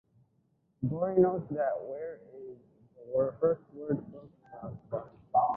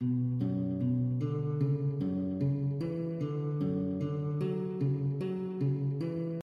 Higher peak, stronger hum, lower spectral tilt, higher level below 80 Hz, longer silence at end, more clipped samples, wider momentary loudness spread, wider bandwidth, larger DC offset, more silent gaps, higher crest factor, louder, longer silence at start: first, -12 dBFS vs -20 dBFS; neither; first, -13 dB/octave vs -11 dB/octave; about the same, -66 dBFS vs -64 dBFS; about the same, 0 s vs 0 s; neither; first, 21 LU vs 4 LU; second, 2.6 kHz vs 5 kHz; neither; neither; first, 20 dB vs 10 dB; about the same, -32 LUFS vs -33 LUFS; first, 0.8 s vs 0 s